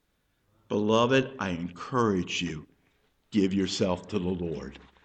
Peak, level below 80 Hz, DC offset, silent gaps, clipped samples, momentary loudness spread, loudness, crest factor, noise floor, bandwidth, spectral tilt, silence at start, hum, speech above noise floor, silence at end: -10 dBFS; -58 dBFS; under 0.1%; none; under 0.1%; 11 LU; -28 LUFS; 20 dB; -72 dBFS; 9 kHz; -5.5 dB/octave; 0.7 s; none; 45 dB; 0.2 s